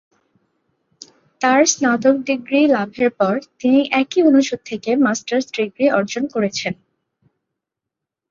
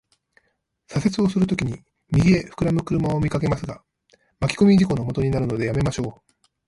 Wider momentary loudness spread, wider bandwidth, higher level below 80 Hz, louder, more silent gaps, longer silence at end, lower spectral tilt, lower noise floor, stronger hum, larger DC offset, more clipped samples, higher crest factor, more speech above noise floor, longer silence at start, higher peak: second, 9 LU vs 12 LU; second, 7.4 kHz vs 11.5 kHz; second, -64 dBFS vs -42 dBFS; first, -17 LUFS vs -22 LUFS; neither; first, 1.55 s vs 0.55 s; second, -3.5 dB/octave vs -7 dB/octave; first, -83 dBFS vs -71 dBFS; neither; neither; neither; about the same, 18 dB vs 16 dB; first, 67 dB vs 50 dB; first, 1.4 s vs 0.9 s; first, -2 dBFS vs -6 dBFS